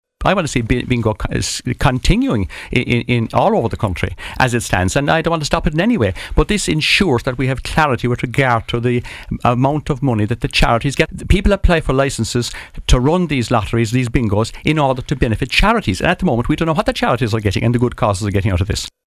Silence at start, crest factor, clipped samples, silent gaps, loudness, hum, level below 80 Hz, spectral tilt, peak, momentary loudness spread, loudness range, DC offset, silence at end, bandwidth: 0.2 s; 16 dB; under 0.1%; none; -16 LUFS; none; -26 dBFS; -5.5 dB/octave; 0 dBFS; 5 LU; 1 LU; under 0.1%; 0.2 s; 15 kHz